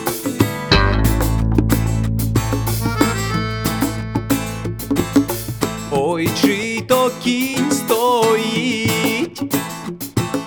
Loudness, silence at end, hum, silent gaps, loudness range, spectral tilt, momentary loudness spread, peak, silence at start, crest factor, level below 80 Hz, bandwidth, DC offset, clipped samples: -18 LUFS; 0 s; none; none; 3 LU; -5 dB/octave; 7 LU; 0 dBFS; 0 s; 18 dB; -28 dBFS; over 20 kHz; under 0.1%; under 0.1%